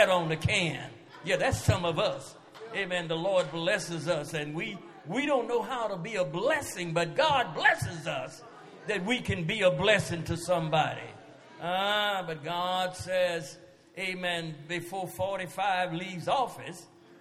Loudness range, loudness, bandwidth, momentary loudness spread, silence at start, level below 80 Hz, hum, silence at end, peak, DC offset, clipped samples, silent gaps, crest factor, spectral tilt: 4 LU; -30 LUFS; 15 kHz; 15 LU; 0 s; -56 dBFS; none; 0.05 s; -6 dBFS; under 0.1%; under 0.1%; none; 24 dB; -4.5 dB/octave